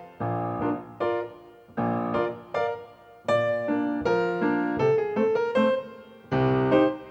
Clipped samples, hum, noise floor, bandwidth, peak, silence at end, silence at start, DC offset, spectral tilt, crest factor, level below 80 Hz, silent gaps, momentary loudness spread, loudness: under 0.1%; none; -47 dBFS; 8.4 kHz; -8 dBFS; 0 s; 0 s; under 0.1%; -8 dB/octave; 18 dB; -56 dBFS; none; 8 LU; -26 LUFS